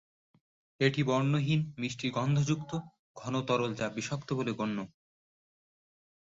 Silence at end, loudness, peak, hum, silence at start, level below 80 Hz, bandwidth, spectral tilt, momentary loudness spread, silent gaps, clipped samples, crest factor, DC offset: 1.45 s; -32 LUFS; -14 dBFS; none; 0.8 s; -66 dBFS; 7.8 kHz; -6 dB/octave; 10 LU; 2.99-3.14 s; under 0.1%; 20 dB; under 0.1%